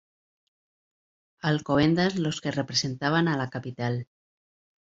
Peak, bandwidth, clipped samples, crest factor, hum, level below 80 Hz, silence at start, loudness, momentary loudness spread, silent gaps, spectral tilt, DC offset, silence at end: -10 dBFS; 7.8 kHz; under 0.1%; 18 dB; none; -60 dBFS; 1.45 s; -26 LUFS; 9 LU; none; -5.5 dB/octave; under 0.1%; 0.85 s